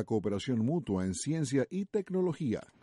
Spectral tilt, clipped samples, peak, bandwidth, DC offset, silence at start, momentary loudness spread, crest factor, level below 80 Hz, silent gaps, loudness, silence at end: -6.5 dB/octave; under 0.1%; -18 dBFS; 11.5 kHz; under 0.1%; 0 s; 3 LU; 14 dB; -64 dBFS; none; -33 LUFS; 0.2 s